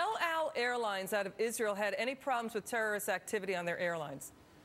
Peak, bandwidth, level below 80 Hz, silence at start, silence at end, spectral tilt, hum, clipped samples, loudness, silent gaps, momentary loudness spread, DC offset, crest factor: -18 dBFS; 16.5 kHz; -76 dBFS; 0 s; 0 s; -3 dB/octave; none; under 0.1%; -36 LUFS; none; 4 LU; under 0.1%; 18 dB